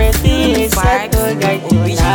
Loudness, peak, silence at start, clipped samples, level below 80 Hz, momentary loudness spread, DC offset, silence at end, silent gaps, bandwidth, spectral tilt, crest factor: -13 LUFS; 0 dBFS; 0 s; under 0.1%; -18 dBFS; 3 LU; under 0.1%; 0 s; none; 19.5 kHz; -5 dB/octave; 12 dB